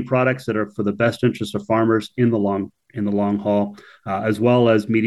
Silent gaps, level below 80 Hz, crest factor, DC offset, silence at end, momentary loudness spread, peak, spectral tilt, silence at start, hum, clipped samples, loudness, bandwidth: none; -60 dBFS; 14 dB; under 0.1%; 0 s; 11 LU; -4 dBFS; -7.5 dB/octave; 0 s; none; under 0.1%; -20 LUFS; 12.5 kHz